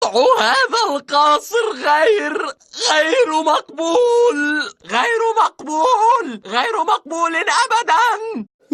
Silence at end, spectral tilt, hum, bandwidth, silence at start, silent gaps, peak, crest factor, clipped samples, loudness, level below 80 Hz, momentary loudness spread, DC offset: 0.3 s; -1 dB/octave; none; 13.5 kHz; 0 s; none; -2 dBFS; 14 dB; under 0.1%; -16 LUFS; -70 dBFS; 7 LU; under 0.1%